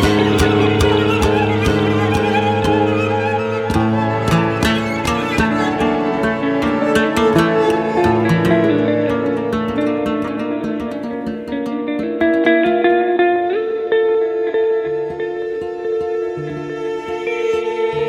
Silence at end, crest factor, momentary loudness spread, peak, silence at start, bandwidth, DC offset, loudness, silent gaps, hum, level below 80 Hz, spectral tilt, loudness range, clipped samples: 0 s; 14 dB; 9 LU; -2 dBFS; 0 s; 16 kHz; under 0.1%; -17 LUFS; none; none; -36 dBFS; -6.5 dB/octave; 5 LU; under 0.1%